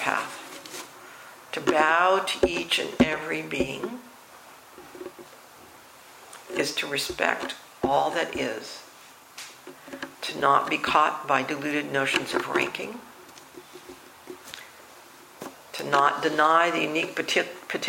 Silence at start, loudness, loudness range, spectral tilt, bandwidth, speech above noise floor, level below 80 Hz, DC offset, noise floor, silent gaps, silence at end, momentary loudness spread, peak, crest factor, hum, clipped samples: 0 s; -25 LUFS; 9 LU; -3 dB/octave; 16.5 kHz; 25 dB; -58 dBFS; under 0.1%; -50 dBFS; none; 0 s; 23 LU; -4 dBFS; 24 dB; none; under 0.1%